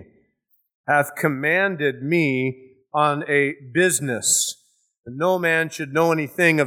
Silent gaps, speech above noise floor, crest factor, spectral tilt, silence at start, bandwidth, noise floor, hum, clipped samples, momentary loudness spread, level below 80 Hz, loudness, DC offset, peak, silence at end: 0.75-0.84 s; 47 dB; 18 dB; -3.5 dB/octave; 0 s; over 20 kHz; -67 dBFS; none; under 0.1%; 7 LU; -70 dBFS; -20 LUFS; under 0.1%; -2 dBFS; 0 s